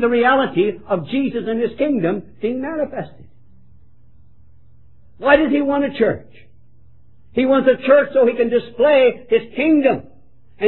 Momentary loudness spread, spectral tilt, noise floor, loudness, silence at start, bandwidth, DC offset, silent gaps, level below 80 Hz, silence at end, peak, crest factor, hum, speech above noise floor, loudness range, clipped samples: 11 LU; -10 dB/octave; -52 dBFS; -17 LUFS; 0 s; 4.2 kHz; 0.9%; none; -52 dBFS; 0 s; 0 dBFS; 18 dB; none; 36 dB; 9 LU; under 0.1%